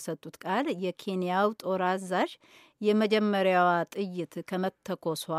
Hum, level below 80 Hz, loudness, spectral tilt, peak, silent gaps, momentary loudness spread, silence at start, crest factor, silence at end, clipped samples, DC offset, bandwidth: none; -82 dBFS; -29 LUFS; -5.5 dB/octave; -12 dBFS; none; 10 LU; 0 s; 18 dB; 0 s; under 0.1%; under 0.1%; 15.5 kHz